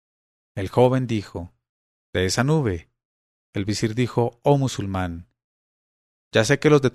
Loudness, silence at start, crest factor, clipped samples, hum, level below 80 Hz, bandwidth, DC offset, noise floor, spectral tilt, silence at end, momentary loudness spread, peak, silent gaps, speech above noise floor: -22 LUFS; 0.55 s; 18 dB; under 0.1%; none; -52 dBFS; 13.5 kHz; under 0.1%; under -90 dBFS; -6 dB/octave; 0.05 s; 15 LU; -4 dBFS; 1.69-2.13 s, 3.05-3.53 s, 5.44-6.31 s; over 69 dB